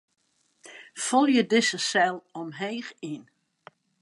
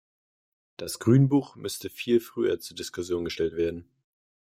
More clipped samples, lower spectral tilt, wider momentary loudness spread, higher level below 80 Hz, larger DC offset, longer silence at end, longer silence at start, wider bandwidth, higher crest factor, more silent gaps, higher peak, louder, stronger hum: neither; second, -3 dB/octave vs -6.5 dB/octave; first, 18 LU vs 14 LU; second, -84 dBFS vs -62 dBFS; neither; first, 0.8 s vs 0.65 s; second, 0.65 s vs 0.8 s; second, 11.5 kHz vs 16 kHz; about the same, 20 dB vs 20 dB; neither; about the same, -8 dBFS vs -8 dBFS; about the same, -25 LUFS vs -27 LUFS; neither